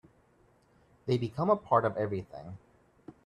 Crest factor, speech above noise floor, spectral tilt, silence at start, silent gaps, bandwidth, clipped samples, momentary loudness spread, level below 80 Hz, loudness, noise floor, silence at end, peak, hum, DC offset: 20 dB; 36 dB; -8.5 dB/octave; 1.05 s; none; 11 kHz; under 0.1%; 21 LU; -66 dBFS; -30 LUFS; -66 dBFS; 0.15 s; -12 dBFS; none; under 0.1%